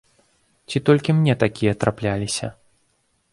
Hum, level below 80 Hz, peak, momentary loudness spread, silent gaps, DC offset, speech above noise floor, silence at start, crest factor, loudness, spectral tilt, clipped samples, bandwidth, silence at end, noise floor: none; -50 dBFS; -2 dBFS; 10 LU; none; under 0.1%; 47 dB; 0.7 s; 20 dB; -21 LUFS; -6 dB/octave; under 0.1%; 11.5 kHz; 0.8 s; -67 dBFS